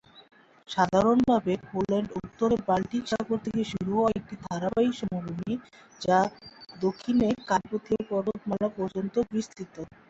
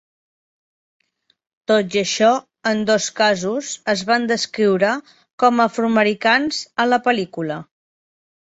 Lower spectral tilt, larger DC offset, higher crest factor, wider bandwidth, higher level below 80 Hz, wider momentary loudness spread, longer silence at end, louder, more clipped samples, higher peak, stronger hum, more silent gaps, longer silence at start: first, -6.5 dB/octave vs -3.5 dB/octave; neither; about the same, 18 dB vs 18 dB; about the same, 8 kHz vs 8.2 kHz; first, -56 dBFS vs -64 dBFS; about the same, 10 LU vs 8 LU; second, 0.25 s vs 0.85 s; second, -28 LUFS vs -18 LUFS; neither; second, -10 dBFS vs -2 dBFS; neither; second, none vs 5.33-5.38 s; second, 0.15 s vs 1.7 s